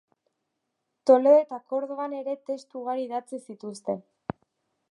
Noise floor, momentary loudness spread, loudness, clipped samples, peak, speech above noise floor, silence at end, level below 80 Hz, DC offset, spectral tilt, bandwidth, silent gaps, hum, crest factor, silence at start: -80 dBFS; 20 LU; -26 LUFS; under 0.1%; -6 dBFS; 55 dB; 0.9 s; -70 dBFS; under 0.1%; -6.5 dB/octave; 11 kHz; none; none; 22 dB; 1.05 s